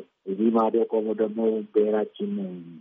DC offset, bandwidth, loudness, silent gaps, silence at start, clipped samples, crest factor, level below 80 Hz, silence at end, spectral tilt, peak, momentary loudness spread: under 0.1%; 3.8 kHz; -25 LUFS; none; 0 s; under 0.1%; 16 dB; -82 dBFS; 0 s; -7 dB/octave; -10 dBFS; 10 LU